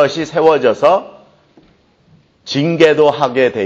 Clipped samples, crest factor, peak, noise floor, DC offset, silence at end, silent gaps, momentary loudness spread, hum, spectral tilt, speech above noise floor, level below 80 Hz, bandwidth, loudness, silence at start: under 0.1%; 14 dB; 0 dBFS; -51 dBFS; under 0.1%; 0 s; none; 8 LU; none; -5.5 dB/octave; 39 dB; -58 dBFS; 7.8 kHz; -13 LUFS; 0 s